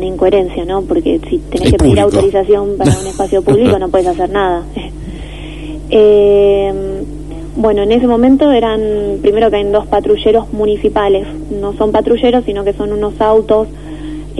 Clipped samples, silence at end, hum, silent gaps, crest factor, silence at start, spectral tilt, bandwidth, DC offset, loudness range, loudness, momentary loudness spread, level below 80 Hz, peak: under 0.1%; 0 s; 50 Hz at -30 dBFS; none; 12 dB; 0 s; -6.5 dB/octave; 11.5 kHz; 1%; 2 LU; -12 LUFS; 16 LU; -26 dBFS; 0 dBFS